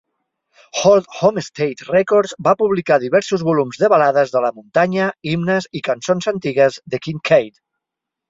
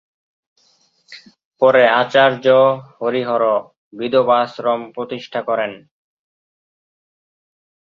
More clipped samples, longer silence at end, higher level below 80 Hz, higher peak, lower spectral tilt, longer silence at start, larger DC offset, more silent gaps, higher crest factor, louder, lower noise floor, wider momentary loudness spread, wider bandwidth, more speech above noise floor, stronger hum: neither; second, 0.8 s vs 2.05 s; first, -58 dBFS vs -68 dBFS; about the same, -2 dBFS vs -2 dBFS; about the same, -5.5 dB/octave vs -6 dB/octave; second, 0.75 s vs 1.1 s; neither; second, none vs 1.45-1.51 s, 3.77-3.91 s; about the same, 16 dB vs 18 dB; about the same, -17 LUFS vs -16 LUFS; first, -83 dBFS vs -59 dBFS; second, 9 LU vs 12 LU; first, 7.8 kHz vs 7 kHz; first, 67 dB vs 43 dB; neither